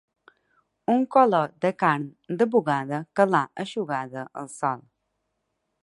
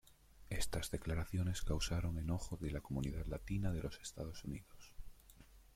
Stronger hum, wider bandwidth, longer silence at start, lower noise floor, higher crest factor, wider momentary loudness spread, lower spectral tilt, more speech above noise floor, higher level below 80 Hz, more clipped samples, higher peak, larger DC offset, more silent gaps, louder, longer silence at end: neither; second, 11.5 kHz vs 16.5 kHz; first, 0.9 s vs 0.1 s; first, -78 dBFS vs -62 dBFS; about the same, 20 dB vs 18 dB; second, 14 LU vs 20 LU; about the same, -6.5 dB/octave vs -5.5 dB/octave; first, 54 dB vs 22 dB; second, -74 dBFS vs -48 dBFS; neither; first, -4 dBFS vs -24 dBFS; neither; neither; first, -24 LUFS vs -43 LUFS; first, 1.05 s vs 0.1 s